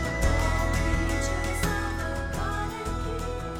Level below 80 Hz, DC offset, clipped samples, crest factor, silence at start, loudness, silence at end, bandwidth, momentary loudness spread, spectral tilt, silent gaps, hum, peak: -30 dBFS; under 0.1%; under 0.1%; 16 dB; 0 s; -28 LUFS; 0 s; 19 kHz; 6 LU; -5 dB/octave; none; none; -10 dBFS